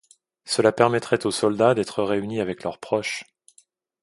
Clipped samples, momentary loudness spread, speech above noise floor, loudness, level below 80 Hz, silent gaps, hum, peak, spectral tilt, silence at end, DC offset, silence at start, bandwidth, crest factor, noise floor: under 0.1%; 10 LU; 38 dB; -23 LUFS; -62 dBFS; none; none; 0 dBFS; -4.5 dB/octave; 0.8 s; under 0.1%; 0.45 s; 11.5 kHz; 22 dB; -60 dBFS